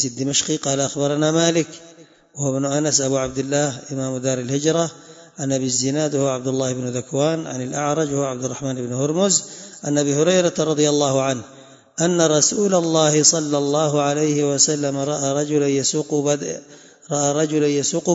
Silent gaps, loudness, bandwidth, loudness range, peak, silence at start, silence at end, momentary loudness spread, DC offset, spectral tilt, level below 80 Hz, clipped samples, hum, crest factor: none; -19 LUFS; 8 kHz; 5 LU; 0 dBFS; 0 s; 0 s; 9 LU; under 0.1%; -4 dB/octave; -60 dBFS; under 0.1%; none; 20 dB